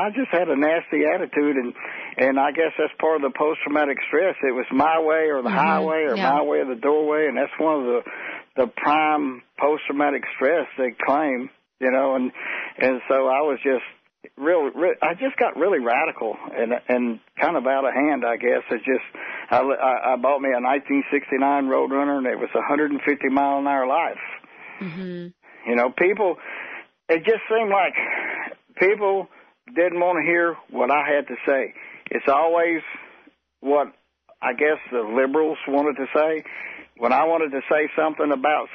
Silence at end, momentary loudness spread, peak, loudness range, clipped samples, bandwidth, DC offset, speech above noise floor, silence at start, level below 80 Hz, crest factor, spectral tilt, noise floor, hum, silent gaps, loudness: 0 s; 11 LU; -6 dBFS; 3 LU; under 0.1%; 6 kHz; under 0.1%; 33 dB; 0 s; -70 dBFS; 16 dB; -3 dB/octave; -54 dBFS; none; none; -22 LUFS